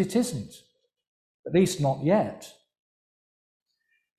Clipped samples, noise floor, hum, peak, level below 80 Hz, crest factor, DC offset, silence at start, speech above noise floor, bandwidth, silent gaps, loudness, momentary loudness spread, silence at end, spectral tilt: under 0.1%; -74 dBFS; none; -10 dBFS; -62 dBFS; 18 dB; under 0.1%; 0 s; 49 dB; 15 kHz; 1.07-1.43 s; -25 LUFS; 21 LU; 1.7 s; -6 dB/octave